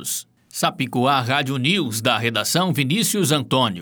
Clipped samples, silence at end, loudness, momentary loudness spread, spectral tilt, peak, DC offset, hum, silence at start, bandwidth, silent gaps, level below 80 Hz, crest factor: under 0.1%; 0 s; -20 LUFS; 5 LU; -4 dB/octave; -4 dBFS; under 0.1%; none; 0 s; over 20 kHz; none; -66 dBFS; 16 dB